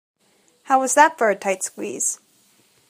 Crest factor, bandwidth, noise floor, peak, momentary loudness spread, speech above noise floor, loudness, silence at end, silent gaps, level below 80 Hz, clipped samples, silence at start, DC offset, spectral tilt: 22 dB; 15.5 kHz; -61 dBFS; 0 dBFS; 11 LU; 42 dB; -19 LUFS; 0.75 s; none; -80 dBFS; under 0.1%; 0.65 s; under 0.1%; -2 dB/octave